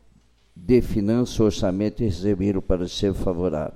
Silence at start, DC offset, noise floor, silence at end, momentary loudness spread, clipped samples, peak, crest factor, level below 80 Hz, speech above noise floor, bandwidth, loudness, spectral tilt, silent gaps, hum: 0.55 s; under 0.1%; -56 dBFS; 0 s; 5 LU; under 0.1%; -6 dBFS; 16 dB; -34 dBFS; 35 dB; 14.5 kHz; -23 LUFS; -7 dB/octave; none; none